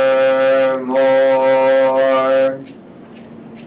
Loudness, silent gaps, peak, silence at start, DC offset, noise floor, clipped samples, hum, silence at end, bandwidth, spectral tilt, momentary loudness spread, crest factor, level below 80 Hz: -14 LUFS; none; -6 dBFS; 0 s; under 0.1%; -38 dBFS; under 0.1%; none; 0 s; 4 kHz; -8.5 dB/octave; 4 LU; 8 dB; -64 dBFS